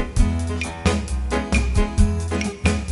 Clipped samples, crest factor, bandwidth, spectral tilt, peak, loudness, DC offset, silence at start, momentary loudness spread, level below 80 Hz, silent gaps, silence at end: under 0.1%; 16 dB; 11.5 kHz; -5.5 dB/octave; -4 dBFS; -22 LUFS; under 0.1%; 0 s; 4 LU; -24 dBFS; none; 0 s